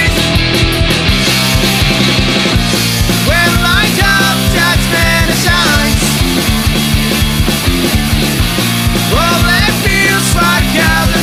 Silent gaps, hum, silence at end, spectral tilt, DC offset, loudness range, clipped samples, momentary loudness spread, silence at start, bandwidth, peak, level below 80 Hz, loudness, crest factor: none; none; 0 s; -3.5 dB/octave; under 0.1%; 2 LU; under 0.1%; 3 LU; 0 s; 16 kHz; 0 dBFS; -20 dBFS; -10 LUFS; 10 dB